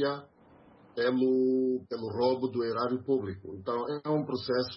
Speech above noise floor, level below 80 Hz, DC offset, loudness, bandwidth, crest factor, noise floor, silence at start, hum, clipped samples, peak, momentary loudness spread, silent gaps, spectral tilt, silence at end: 28 dB; -70 dBFS; under 0.1%; -30 LUFS; 5.8 kHz; 14 dB; -58 dBFS; 0 s; none; under 0.1%; -16 dBFS; 10 LU; none; -10 dB/octave; 0 s